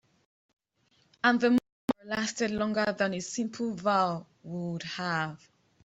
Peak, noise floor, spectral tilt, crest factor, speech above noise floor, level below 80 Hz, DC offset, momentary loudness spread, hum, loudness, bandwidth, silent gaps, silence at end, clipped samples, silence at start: -8 dBFS; -70 dBFS; -4.5 dB/octave; 22 dB; 41 dB; -68 dBFS; under 0.1%; 10 LU; none; -30 LUFS; 8.2 kHz; 1.72-1.88 s; 0.5 s; under 0.1%; 1.25 s